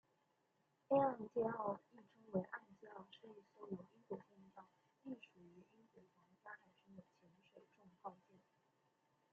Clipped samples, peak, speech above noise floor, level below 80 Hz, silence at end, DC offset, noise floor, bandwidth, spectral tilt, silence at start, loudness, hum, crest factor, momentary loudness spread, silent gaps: under 0.1%; -24 dBFS; 41 dB; -88 dBFS; 1.2 s; under 0.1%; -82 dBFS; 6.6 kHz; -6.5 dB/octave; 0.9 s; -45 LUFS; none; 24 dB; 25 LU; none